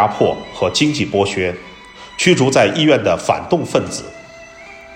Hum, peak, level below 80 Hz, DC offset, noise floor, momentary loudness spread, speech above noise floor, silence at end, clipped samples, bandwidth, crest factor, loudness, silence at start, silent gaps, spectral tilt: none; 0 dBFS; -50 dBFS; under 0.1%; -38 dBFS; 23 LU; 22 dB; 0 s; under 0.1%; 16 kHz; 16 dB; -16 LUFS; 0 s; none; -4.5 dB/octave